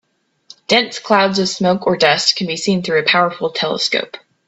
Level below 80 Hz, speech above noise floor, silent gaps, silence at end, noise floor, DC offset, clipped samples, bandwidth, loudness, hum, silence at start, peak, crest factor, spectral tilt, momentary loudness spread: -60 dBFS; 30 dB; none; 0.3 s; -46 dBFS; under 0.1%; under 0.1%; 8.4 kHz; -15 LUFS; none; 0.7 s; 0 dBFS; 16 dB; -3.5 dB/octave; 6 LU